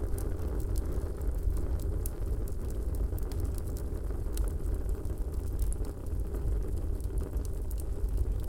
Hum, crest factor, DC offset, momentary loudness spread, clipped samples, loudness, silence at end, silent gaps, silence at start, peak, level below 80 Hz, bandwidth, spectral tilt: none; 14 dB; 0.2%; 3 LU; under 0.1%; -36 LUFS; 0 s; none; 0 s; -18 dBFS; -32 dBFS; 17 kHz; -7 dB/octave